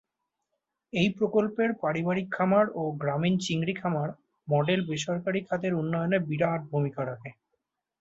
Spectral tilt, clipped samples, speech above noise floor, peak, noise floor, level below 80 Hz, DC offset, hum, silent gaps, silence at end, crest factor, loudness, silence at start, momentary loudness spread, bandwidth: -6.5 dB/octave; under 0.1%; 55 dB; -10 dBFS; -83 dBFS; -66 dBFS; under 0.1%; none; none; 0.7 s; 18 dB; -28 LUFS; 0.95 s; 8 LU; 8 kHz